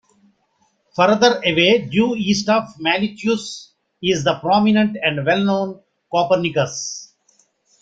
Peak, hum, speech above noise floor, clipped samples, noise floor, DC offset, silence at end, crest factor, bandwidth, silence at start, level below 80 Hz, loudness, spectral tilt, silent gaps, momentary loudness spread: 0 dBFS; none; 47 dB; under 0.1%; -64 dBFS; under 0.1%; 0.75 s; 18 dB; 7.8 kHz; 0.95 s; -58 dBFS; -18 LUFS; -4.5 dB/octave; none; 12 LU